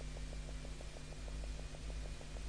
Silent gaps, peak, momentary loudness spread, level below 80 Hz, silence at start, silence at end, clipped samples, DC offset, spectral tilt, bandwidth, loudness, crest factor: none; -34 dBFS; 3 LU; -46 dBFS; 0 s; 0 s; under 0.1%; under 0.1%; -4.5 dB/octave; 10.5 kHz; -49 LUFS; 12 dB